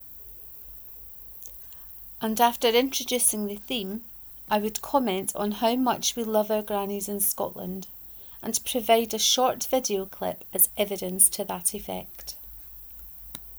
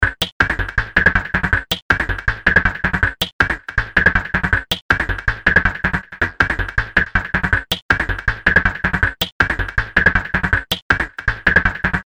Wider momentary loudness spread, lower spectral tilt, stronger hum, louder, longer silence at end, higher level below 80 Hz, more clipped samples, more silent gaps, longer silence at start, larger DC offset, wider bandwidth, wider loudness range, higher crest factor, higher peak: first, 16 LU vs 5 LU; second, -2 dB/octave vs -4.5 dB/octave; neither; second, -25 LUFS vs -17 LUFS; about the same, 0 s vs 0.05 s; second, -56 dBFS vs -28 dBFS; neither; second, none vs 0.32-0.40 s, 1.82-1.89 s, 3.33-3.39 s, 4.82-4.89 s, 7.82-7.89 s, 9.32-9.40 s, 10.82-10.90 s; about the same, 0 s vs 0 s; second, under 0.1% vs 0.2%; first, over 20 kHz vs 16.5 kHz; first, 4 LU vs 1 LU; first, 24 dB vs 18 dB; second, -4 dBFS vs 0 dBFS